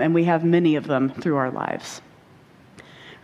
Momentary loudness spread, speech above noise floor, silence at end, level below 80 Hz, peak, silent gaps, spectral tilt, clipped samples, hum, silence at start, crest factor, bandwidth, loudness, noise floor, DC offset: 18 LU; 30 dB; 0.1 s; -64 dBFS; -6 dBFS; none; -7 dB/octave; under 0.1%; none; 0 s; 16 dB; 11.5 kHz; -22 LUFS; -51 dBFS; under 0.1%